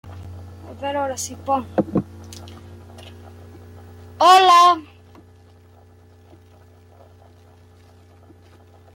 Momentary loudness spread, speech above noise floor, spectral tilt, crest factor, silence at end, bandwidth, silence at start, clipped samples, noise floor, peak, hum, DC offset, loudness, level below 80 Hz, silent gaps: 29 LU; 33 dB; -3.5 dB/octave; 20 dB; 4.15 s; 16.5 kHz; 0.05 s; under 0.1%; -49 dBFS; -2 dBFS; none; under 0.1%; -17 LUFS; -60 dBFS; none